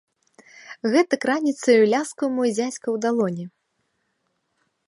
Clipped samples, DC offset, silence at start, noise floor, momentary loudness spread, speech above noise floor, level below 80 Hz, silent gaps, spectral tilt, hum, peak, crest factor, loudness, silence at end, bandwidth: under 0.1%; under 0.1%; 0.65 s; -73 dBFS; 12 LU; 52 dB; -78 dBFS; none; -5 dB/octave; none; -6 dBFS; 18 dB; -21 LUFS; 1.4 s; 11.5 kHz